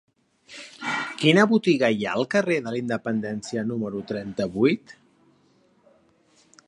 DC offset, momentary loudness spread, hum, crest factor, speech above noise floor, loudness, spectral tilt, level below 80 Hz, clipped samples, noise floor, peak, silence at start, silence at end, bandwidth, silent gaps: under 0.1%; 13 LU; none; 22 dB; 39 dB; -24 LUFS; -5.5 dB/octave; -64 dBFS; under 0.1%; -62 dBFS; -4 dBFS; 0.5 s; 1.75 s; 11 kHz; none